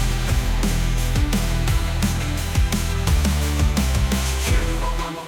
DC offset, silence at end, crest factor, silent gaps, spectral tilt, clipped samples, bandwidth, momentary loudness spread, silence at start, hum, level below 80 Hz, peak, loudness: under 0.1%; 0 s; 12 dB; none; -4.5 dB/octave; under 0.1%; 19 kHz; 3 LU; 0 s; none; -22 dBFS; -8 dBFS; -22 LUFS